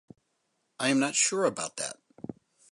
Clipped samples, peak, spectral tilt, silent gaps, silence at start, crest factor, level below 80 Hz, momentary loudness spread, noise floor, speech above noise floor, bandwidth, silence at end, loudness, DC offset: under 0.1%; -10 dBFS; -2.5 dB/octave; none; 0.8 s; 20 dB; -76 dBFS; 20 LU; -77 dBFS; 49 dB; 11.5 kHz; 0.4 s; -28 LUFS; under 0.1%